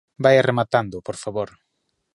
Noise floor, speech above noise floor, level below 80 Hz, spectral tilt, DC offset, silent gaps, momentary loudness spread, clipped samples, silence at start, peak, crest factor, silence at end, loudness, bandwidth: -74 dBFS; 54 dB; -58 dBFS; -6 dB/octave; under 0.1%; none; 14 LU; under 0.1%; 0.2 s; -2 dBFS; 20 dB; 0.7 s; -20 LUFS; 11.5 kHz